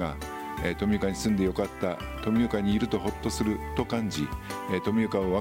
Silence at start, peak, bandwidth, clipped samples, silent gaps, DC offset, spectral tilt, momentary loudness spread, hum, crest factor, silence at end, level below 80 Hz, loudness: 0 s; -12 dBFS; 16.5 kHz; under 0.1%; none; under 0.1%; -6 dB/octave; 7 LU; none; 16 dB; 0 s; -42 dBFS; -29 LUFS